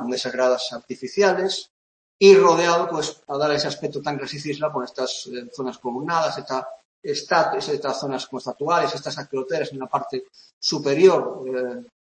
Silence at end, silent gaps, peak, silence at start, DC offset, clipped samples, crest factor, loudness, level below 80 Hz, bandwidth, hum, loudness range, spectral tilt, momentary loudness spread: 0.2 s; 1.70-2.19 s, 6.85-7.02 s, 10.53-10.61 s; 0 dBFS; 0 s; under 0.1%; under 0.1%; 20 dB; -22 LUFS; -68 dBFS; 8.8 kHz; none; 7 LU; -4 dB/octave; 13 LU